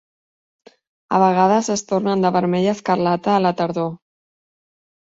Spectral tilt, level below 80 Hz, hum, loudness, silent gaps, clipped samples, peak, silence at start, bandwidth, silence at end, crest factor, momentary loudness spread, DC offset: -6 dB/octave; -62 dBFS; none; -18 LUFS; none; under 0.1%; -2 dBFS; 1.1 s; 7.8 kHz; 1.05 s; 18 dB; 7 LU; under 0.1%